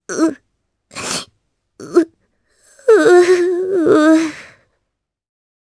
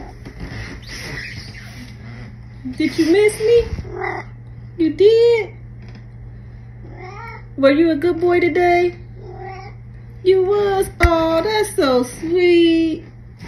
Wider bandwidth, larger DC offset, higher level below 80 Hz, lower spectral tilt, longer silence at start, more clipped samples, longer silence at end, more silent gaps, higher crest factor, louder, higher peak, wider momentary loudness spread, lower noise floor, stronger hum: second, 11 kHz vs 13 kHz; neither; second, -62 dBFS vs -34 dBFS; second, -4 dB/octave vs -6 dB/octave; about the same, 0.1 s vs 0 s; neither; first, 1.35 s vs 0 s; neither; about the same, 16 dB vs 18 dB; about the same, -14 LUFS vs -16 LUFS; about the same, 0 dBFS vs 0 dBFS; second, 15 LU vs 23 LU; first, -75 dBFS vs -36 dBFS; neither